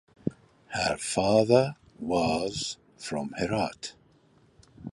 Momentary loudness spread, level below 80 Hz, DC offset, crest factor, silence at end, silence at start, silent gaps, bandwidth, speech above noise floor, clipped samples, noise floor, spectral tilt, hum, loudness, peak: 16 LU; -56 dBFS; under 0.1%; 22 dB; 0 s; 0.25 s; none; 12 kHz; 35 dB; under 0.1%; -61 dBFS; -4.5 dB/octave; none; -28 LUFS; -6 dBFS